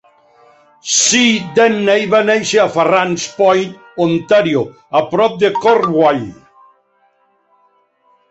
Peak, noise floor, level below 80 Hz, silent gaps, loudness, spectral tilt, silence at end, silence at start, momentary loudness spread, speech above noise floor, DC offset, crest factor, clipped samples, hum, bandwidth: 0 dBFS; -57 dBFS; -58 dBFS; none; -13 LUFS; -3 dB/octave; 2 s; 0.85 s; 7 LU; 44 dB; under 0.1%; 14 dB; under 0.1%; none; 8.2 kHz